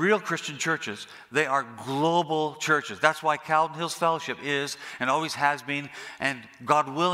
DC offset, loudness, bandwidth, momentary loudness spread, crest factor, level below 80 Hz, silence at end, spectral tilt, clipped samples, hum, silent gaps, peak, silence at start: under 0.1%; -26 LUFS; 16 kHz; 8 LU; 24 dB; -74 dBFS; 0 s; -4 dB/octave; under 0.1%; none; none; -2 dBFS; 0 s